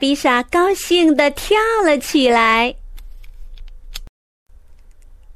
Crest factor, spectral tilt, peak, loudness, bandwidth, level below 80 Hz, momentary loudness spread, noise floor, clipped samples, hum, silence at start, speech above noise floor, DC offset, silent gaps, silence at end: 16 dB; -2.5 dB/octave; -2 dBFS; -15 LUFS; 15.5 kHz; -38 dBFS; 22 LU; -42 dBFS; under 0.1%; none; 0 s; 27 dB; under 0.1%; 4.09-4.46 s; 0 s